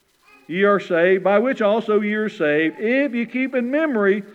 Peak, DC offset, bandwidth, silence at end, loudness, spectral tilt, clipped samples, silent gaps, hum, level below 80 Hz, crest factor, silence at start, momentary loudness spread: -4 dBFS; under 0.1%; 8.2 kHz; 0.05 s; -19 LUFS; -7 dB/octave; under 0.1%; none; none; -76 dBFS; 16 dB; 0.5 s; 5 LU